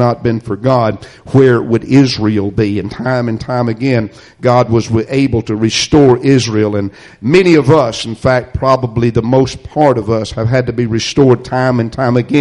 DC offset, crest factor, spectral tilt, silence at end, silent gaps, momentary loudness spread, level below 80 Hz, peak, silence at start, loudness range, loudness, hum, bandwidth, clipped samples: under 0.1%; 12 dB; -6.5 dB/octave; 0 s; none; 8 LU; -36 dBFS; 0 dBFS; 0 s; 3 LU; -12 LUFS; none; 11 kHz; under 0.1%